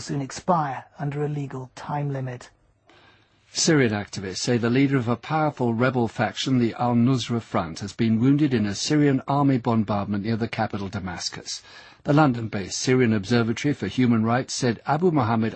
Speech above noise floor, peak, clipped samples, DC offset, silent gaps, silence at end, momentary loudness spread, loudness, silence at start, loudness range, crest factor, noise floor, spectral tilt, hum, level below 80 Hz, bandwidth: 34 dB; -6 dBFS; under 0.1%; under 0.1%; none; 0 s; 11 LU; -23 LUFS; 0 s; 4 LU; 18 dB; -57 dBFS; -5.5 dB/octave; none; -58 dBFS; 8.8 kHz